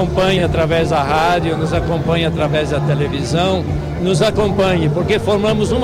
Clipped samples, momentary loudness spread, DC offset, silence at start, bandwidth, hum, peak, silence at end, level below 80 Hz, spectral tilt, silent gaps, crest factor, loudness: under 0.1%; 3 LU; under 0.1%; 0 s; 14 kHz; none; -2 dBFS; 0 s; -30 dBFS; -6 dB/octave; none; 12 dB; -16 LUFS